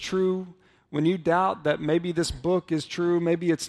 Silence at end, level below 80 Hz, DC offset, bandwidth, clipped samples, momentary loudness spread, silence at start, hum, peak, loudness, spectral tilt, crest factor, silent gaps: 0 s; -50 dBFS; under 0.1%; 12.5 kHz; under 0.1%; 6 LU; 0 s; none; -10 dBFS; -26 LUFS; -5.5 dB/octave; 16 dB; none